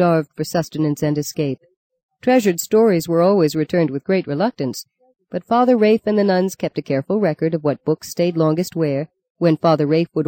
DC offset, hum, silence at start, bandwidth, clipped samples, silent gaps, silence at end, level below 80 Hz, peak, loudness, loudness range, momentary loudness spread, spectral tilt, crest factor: under 0.1%; none; 0 s; 17 kHz; under 0.1%; 1.77-1.90 s, 2.03-2.09 s, 9.30-9.35 s; 0 s; -60 dBFS; -4 dBFS; -18 LUFS; 2 LU; 9 LU; -6.5 dB/octave; 14 dB